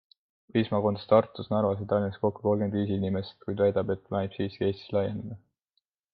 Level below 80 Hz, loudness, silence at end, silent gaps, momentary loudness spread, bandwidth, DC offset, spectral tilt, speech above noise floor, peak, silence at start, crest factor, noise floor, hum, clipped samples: -66 dBFS; -28 LUFS; 0.75 s; none; 9 LU; 5.2 kHz; under 0.1%; -10.5 dB/octave; 51 dB; -6 dBFS; 0.55 s; 22 dB; -79 dBFS; none; under 0.1%